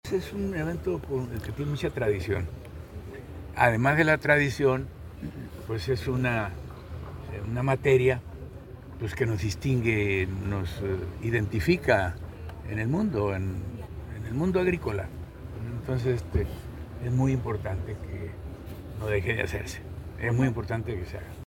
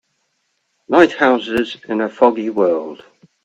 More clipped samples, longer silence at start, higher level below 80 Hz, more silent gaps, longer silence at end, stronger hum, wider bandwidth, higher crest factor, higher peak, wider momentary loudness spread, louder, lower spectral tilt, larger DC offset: neither; second, 0.05 s vs 0.9 s; first, -42 dBFS vs -56 dBFS; neither; second, 0 s vs 0.5 s; neither; first, 17 kHz vs 8.4 kHz; first, 24 dB vs 18 dB; second, -6 dBFS vs 0 dBFS; first, 18 LU vs 9 LU; second, -28 LUFS vs -16 LUFS; first, -7 dB/octave vs -5.5 dB/octave; neither